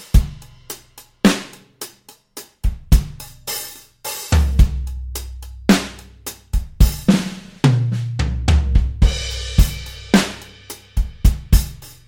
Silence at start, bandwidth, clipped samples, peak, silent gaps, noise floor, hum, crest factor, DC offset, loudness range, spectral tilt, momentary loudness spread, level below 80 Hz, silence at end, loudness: 0 s; 17 kHz; under 0.1%; -2 dBFS; none; -47 dBFS; none; 16 dB; under 0.1%; 4 LU; -5.5 dB/octave; 17 LU; -20 dBFS; 0.2 s; -19 LUFS